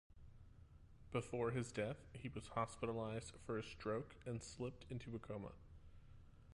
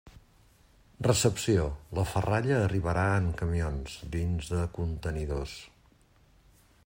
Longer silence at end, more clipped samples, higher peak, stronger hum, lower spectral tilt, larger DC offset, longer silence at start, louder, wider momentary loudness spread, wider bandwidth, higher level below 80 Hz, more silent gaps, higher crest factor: second, 0 s vs 1.2 s; neither; second, -28 dBFS vs -12 dBFS; neither; about the same, -6 dB/octave vs -5.5 dB/octave; neither; about the same, 0.1 s vs 0.05 s; second, -47 LUFS vs -30 LUFS; first, 23 LU vs 9 LU; second, 11.5 kHz vs 16 kHz; second, -64 dBFS vs -44 dBFS; neither; about the same, 20 dB vs 20 dB